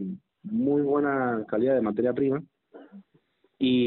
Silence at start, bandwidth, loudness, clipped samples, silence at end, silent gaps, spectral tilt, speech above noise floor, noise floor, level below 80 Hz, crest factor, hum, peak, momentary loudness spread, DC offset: 0 s; 4.2 kHz; -26 LUFS; under 0.1%; 0 s; none; -5.5 dB/octave; 42 dB; -67 dBFS; -66 dBFS; 14 dB; none; -14 dBFS; 9 LU; under 0.1%